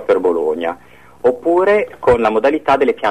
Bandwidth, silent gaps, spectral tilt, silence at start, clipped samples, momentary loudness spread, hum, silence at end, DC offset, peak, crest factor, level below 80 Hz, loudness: 10 kHz; none; -6.5 dB/octave; 0 s; under 0.1%; 7 LU; none; 0 s; 0.4%; -4 dBFS; 12 dB; -42 dBFS; -15 LUFS